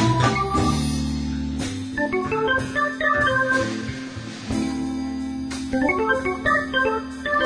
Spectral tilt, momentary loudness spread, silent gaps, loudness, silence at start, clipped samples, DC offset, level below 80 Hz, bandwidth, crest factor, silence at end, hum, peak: -5.5 dB/octave; 9 LU; none; -23 LUFS; 0 s; under 0.1%; under 0.1%; -38 dBFS; 10.5 kHz; 20 dB; 0 s; none; -4 dBFS